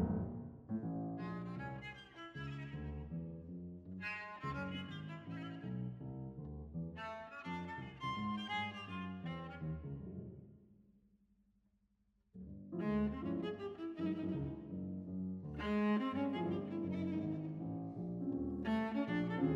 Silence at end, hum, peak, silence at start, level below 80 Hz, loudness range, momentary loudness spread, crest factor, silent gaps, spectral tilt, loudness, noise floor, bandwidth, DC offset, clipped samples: 0 s; none; -24 dBFS; 0 s; -60 dBFS; 7 LU; 12 LU; 18 dB; none; -8 dB/octave; -43 LUFS; -78 dBFS; 7.6 kHz; under 0.1%; under 0.1%